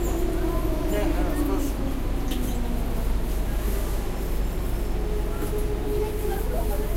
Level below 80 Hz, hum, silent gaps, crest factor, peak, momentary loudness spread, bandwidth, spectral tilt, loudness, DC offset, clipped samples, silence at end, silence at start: -26 dBFS; none; none; 12 dB; -12 dBFS; 4 LU; 16 kHz; -6 dB/octave; -28 LUFS; under 0.1%; under 0.1%; 0 s; 0 s